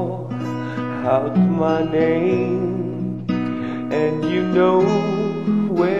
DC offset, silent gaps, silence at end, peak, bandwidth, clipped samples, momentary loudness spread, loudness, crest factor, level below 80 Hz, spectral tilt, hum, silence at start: 0.5%; none; 0 s; -4 dBFS; 7.6 kHz; under 0.1%; 9 LU; -20 LUFS; 14 dB; -54 dBFS; -8.5 dB/octave; none; 0 s